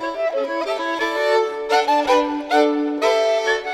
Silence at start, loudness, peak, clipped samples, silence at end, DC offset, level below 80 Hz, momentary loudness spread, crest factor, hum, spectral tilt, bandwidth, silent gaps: 0 s; -19 LUFS; -4 dBFS; under 0.1%; 0 s; under 0.1%; -58 dBFS; 6 LU; 14 dB; none; -2 dB/octave; 15 kHz; none